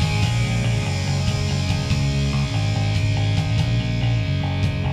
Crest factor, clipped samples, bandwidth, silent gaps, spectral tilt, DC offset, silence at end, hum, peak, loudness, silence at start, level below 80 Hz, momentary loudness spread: 12 dB; under 0.1%; 12 kHz; none; -5.5 dB/octave; under 0.1%; 0 s; none; -8 dBFS; -21 LUFS; 0 s; -32 dBFS; 2 LU